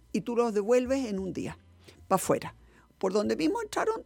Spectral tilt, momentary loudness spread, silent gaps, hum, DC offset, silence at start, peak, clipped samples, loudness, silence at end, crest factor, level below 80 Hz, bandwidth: -5 dB/octave; 12 LU; none; none; under 0.1%; 0.15 s; -10 dBFS; under 0.1%; -29 LUFS; 0 s; 20 dB; -58 dBFS; 17.5 kHz